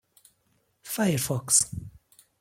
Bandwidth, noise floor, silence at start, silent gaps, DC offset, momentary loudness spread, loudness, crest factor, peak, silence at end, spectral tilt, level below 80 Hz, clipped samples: 16.5 kHz; -71 dBFS; 0.85 s; none; under 0.1%; 13 LU; -24 LUFS; 24 dB; -6 dBFS; 0.5 s; -3.5 dB/octave; -58 dBFS; under 0.1%